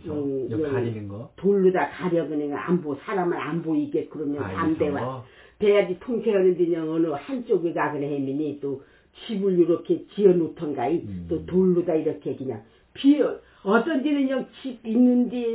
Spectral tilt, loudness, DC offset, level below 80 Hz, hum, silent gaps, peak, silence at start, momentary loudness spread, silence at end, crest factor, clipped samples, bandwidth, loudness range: -11.5 dB/octave; -24 LUFS; under 0.1%; -56 dBFS; none; none; -6 dBFS; 0.05 s; 11 LU; 0 s; 18 dB; under 0.1%; 4 kHz; 3 LU